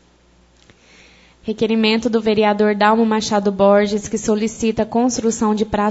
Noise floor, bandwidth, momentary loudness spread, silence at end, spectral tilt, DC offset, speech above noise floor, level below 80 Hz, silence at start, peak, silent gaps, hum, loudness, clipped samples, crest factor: -53 dBFS; 8 kHz; 6 LU; 0 s; -4.5 dB/octave; under 0.1%; 37 dB; -48 dBFS; 1.45 s; -2 dBFS; none; none; -17 LUFS; under 0.1%; 16 dB